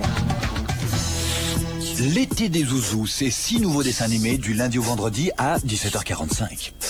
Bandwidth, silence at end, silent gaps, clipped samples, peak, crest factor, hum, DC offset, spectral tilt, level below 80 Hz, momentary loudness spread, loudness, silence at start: over 20 kHz; 0 s; none; under 0.1%; -8 dBFS; 16 dB; none; under 0.1%; -4 dB/octave; -36 dBFS; 4 LU; -23 LUFS; 0 s